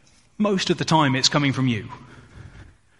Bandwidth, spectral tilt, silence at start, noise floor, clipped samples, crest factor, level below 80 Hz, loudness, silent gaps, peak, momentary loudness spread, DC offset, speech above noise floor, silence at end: 11.5 kHz; -4.5 dB/octave; 0.4 s; -48 dBFS; under 0.1%; 20 dB; -54 dBFS; -21 LUFS; none; -2 dBFS; 9 LU; under 0.1%; 27 dB; 0.35 s